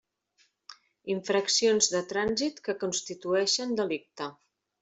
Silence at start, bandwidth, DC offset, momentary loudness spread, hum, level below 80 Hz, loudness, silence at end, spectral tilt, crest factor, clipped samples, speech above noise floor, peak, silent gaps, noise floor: 0.7 s; 8.2 kHz; under 0.1%; 13 LU; none; -68 dBFS; -28 LUFS; 0.5 s; -2 dB/octave; 20 dB; under 0.1%; 41 dB; -10 dBFS; none; -70 dBFS